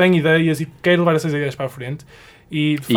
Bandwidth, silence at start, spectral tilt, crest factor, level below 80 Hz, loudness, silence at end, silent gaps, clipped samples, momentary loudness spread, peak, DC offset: 17.5 kHz; 0 s; -6.5 dB/octave; 16 dB; -56 dBFS; -18 LUFS; 0 s; none; under 0.1%; 15 LU; -4 dBFS; under 0.1%